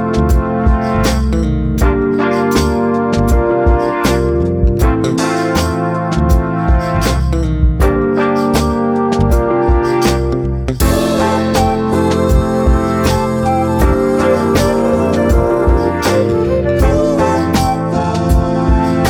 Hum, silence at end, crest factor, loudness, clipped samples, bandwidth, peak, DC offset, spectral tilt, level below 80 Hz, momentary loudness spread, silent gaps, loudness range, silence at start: none; 0 s; 12 dB; -13 LUFS; under 0.1%; 19 kHz; 0 dBFS; under 0.1%; -6.5 dB/octave; -18 dBFS; 2 LU; none; 1 LU; 0 s